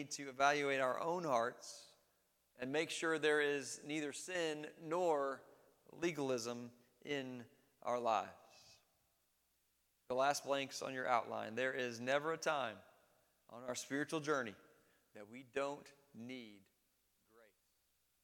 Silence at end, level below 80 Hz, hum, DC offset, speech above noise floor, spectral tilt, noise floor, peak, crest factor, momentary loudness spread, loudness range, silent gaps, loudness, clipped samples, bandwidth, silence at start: 1.65 s; -88 dBFS; none; under 0.1%; 41 dB; -3.5 dB/octave; -81 dBFS; -18 dBFS; 24 dB; 17 LU; 6 LU; none; -40 LUFS; under 0.1%; 18.5 kHz; 0 s